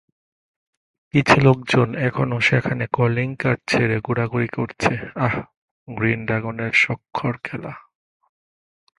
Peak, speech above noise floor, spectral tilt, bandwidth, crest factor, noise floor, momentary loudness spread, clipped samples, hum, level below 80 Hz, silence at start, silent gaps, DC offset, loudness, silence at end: 0 dBFS; over 70 dB; -6.5 dB/octave; 11.5 kHz; 22 dB; under -90 dBFS; 10 LU; under 0.1%; none; -50 dBFS; 1.15 s; 5.57-5.86 s; under 0.1%; -20 LUFS; 1.2 s